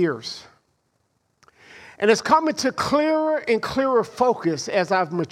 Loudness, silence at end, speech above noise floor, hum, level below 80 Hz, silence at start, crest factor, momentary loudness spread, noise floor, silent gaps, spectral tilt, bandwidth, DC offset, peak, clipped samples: -21 LUFS; 0.05 s; 48 dB; none; -58 dBFS; 0 s; 18 dB; 6 LU; -69 dBFS; none; -4.5 dB/octave; 15 kHz; under 0.1%; -4 dBFS; under 0.1%